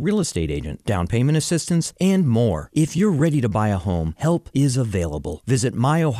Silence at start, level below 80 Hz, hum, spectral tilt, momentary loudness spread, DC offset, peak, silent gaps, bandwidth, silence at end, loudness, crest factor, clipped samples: 0 s; -40 dBFS; none; -6 dB/octave; 6 LU; under 0.1%; -8 dBFS; none; 14 kHz; 0 s; -21 LUFS; 12 dB; under 0.1%